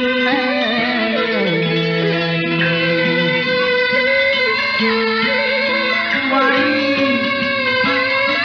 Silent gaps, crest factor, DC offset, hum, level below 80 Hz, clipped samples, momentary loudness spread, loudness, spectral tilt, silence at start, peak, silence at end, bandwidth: none; 12 dB; under 0.1%; none; -54 dBFS; under 0.1%; 3 LU; -15 LUFS; -6 dB/octave; 0 s; -4 dBFS; 0 s; 7 kHz